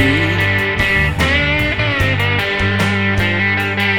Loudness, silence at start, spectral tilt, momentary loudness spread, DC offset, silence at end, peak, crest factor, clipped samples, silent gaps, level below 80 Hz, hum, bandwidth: -14 LUFS; 0 s; -5.5 dB/octave; 2 LU; under 0.1%; 0 s; 0 dBFS; 14 dB; under 0.1%; none; -28 dBFS; none; 17 kHz